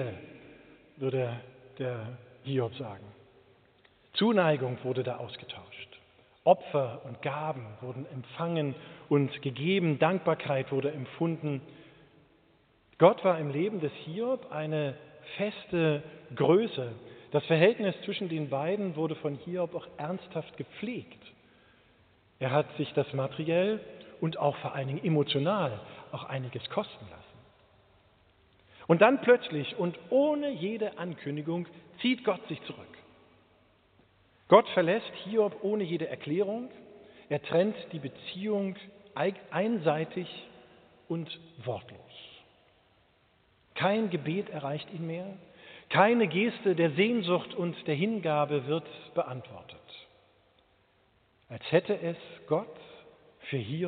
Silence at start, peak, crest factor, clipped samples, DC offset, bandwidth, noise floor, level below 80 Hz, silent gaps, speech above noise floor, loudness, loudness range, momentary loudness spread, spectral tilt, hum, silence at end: 0 s; -6 dBFS; 26 dB; under 0.1%; under 0.1%; 4.6 kHz; -67 dBFS; -74 dBFS; none; 38 dB; -30 LUFS; 8 LU; 19 LU; -5 dB/octave; none; 0 s